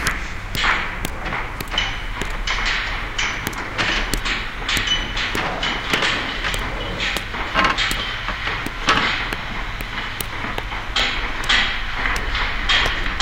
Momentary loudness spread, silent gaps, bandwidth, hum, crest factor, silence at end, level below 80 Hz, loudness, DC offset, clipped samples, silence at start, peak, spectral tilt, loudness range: 9 LU; none; 17 kHz; none; 22 dB; 0 s; -30 dBFS; -21 LUFS; under 0.1%; under 0.1%; 0 s; 0 dBFS; -2.5 dB/octave; 2 LU